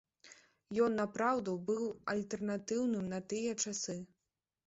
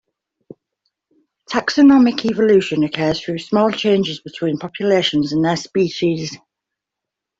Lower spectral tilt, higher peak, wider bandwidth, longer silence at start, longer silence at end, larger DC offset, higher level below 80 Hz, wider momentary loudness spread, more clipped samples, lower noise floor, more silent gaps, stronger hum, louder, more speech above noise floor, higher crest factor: about the same, -5 dB/octave vs -5.5 dB/octave; second, -20 dBFS vs -2 dBFS; about the same, 8 kHz vs 7.8 kHz; second, 0.25 s vs 1.5 s; second, 0.6 s vs 1.05 s; neither; second, -74 dBFS vs -56 dBFS; second, 7 LU vs 11 LU; neither; first, -89 dBFS vs -83 dBFS; neither; neither; second, -37 LUFS vs -17 LUFS; second, 54 dB vs 67 dB; about the same, 18 dB vs 16 dB